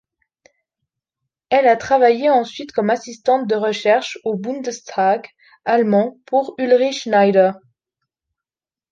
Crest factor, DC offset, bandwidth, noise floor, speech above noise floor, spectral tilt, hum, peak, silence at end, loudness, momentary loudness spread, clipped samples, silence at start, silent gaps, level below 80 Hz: 16 dB; under 0.1%; 7.6 kHz; under -90 dBFS; over 73 dB; -5 dB/octave; none; -2 dBFS; 1.35 s; -17 LUFS; 10 LU; under 0.1%; 1.5 s; none; -64 dBFS